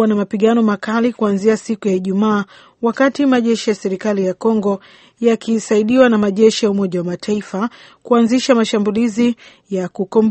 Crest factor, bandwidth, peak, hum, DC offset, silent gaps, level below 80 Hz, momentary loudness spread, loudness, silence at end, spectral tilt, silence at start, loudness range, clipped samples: 16 dB; 8.6 kHz; 0 dBFS; none; under 0.1%; none; -58 dBFS; 9 LU; -16 LUFS; 0 s; -5.5 dB/octave; 0 s; 2 LU; under 0.1%